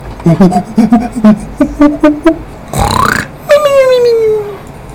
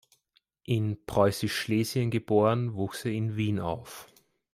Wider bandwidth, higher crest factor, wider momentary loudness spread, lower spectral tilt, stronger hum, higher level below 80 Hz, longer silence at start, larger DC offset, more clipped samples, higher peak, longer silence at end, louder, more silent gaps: first, 19 kHz vs 15.5 kHz; second, 8 dB vs 20 dB; second, 9 LU vs 12 LU; about the same, -6.5 dB/octave vs -6 dB/octave; neither; first, -28 dBFS vs -60 dBFS; second, 0 s vs 0.7 s; neither; first, 5% vs under 0.1%; first, 0 dBFS vs -8 dBFS; second, 0 s vs 0.5 s; first, -9 LUFS vs -28 LUFS; neither